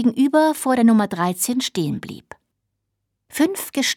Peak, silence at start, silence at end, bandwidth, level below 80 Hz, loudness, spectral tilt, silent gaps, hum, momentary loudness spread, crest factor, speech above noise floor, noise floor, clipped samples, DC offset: -6 dBFS; 0 s; 0 s; 18 kHz; -64 dBFS; -19 LUFS; -4 dB/octave; none; none; 15 LU; 16 dB; 58 dB; -77 dBFS; under 0.1%; under 0.1%